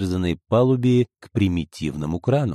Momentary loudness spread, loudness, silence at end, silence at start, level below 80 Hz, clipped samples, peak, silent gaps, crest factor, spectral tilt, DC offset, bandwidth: 8 LU; -22 LUFS; 0 s; 0 s; -44 dBFS; under 0.1%; -6 dBFS; none; 14 dB; -8 dB/octave; under 0.1%; 12.5 kHz